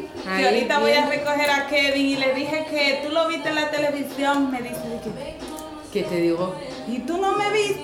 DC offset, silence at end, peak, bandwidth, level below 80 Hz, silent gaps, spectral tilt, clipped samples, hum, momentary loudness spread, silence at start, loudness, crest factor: under 0.1%; 0 s; -8 dBFS; 17 kHz; -54 dBFS; none; -4 dB/octave; under 0.1%; none; 12 LU; 0 s; -22 LUFS; 16 dB